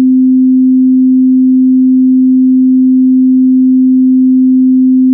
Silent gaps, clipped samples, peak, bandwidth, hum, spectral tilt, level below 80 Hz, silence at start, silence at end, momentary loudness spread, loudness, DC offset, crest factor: none; under 0.1%; -2 dBFS; 0.4 kHz; none; -17.5 dB/octave; -70 dBFS; 0 s; 0 s; 0 LU; -7 LUFS; under 0.1%; 4 dB